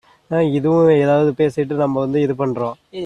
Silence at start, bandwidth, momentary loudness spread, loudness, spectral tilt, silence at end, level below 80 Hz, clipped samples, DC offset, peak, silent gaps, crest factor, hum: 0.3 s; 10 kHz; 9 LU; -17 LUFS; -8.5 dB/octave; 0 s; -56 dBFS; under 0.1%; under 0.1%; -4 dBFS; none; 14 dB; none